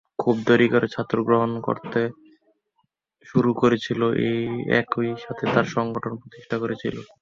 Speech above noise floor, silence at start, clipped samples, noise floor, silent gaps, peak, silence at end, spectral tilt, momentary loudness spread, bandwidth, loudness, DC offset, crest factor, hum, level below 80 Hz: 50 dB; 0.2 s; under 0.1%; -72 dBFS; none; -4 dBFS; 0.15 s; -7 dB/octave; 10 LU; 7.4 kHz; -23 LUFS; under 0.1%; 20 dB; none; -60 dBFS